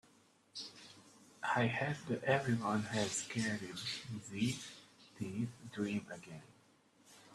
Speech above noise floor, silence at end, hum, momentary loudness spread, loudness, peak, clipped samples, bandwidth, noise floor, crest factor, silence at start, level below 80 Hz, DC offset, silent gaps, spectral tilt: 30 dB; 0 s; none; 17 LU; -39 LUFS; -16 dBFS; under 0.1%; 13 kHz; -69 dBFS; 24 dB; 0.55 s; -74 dBFS; under 0.1%; none; -4.5 dB/octave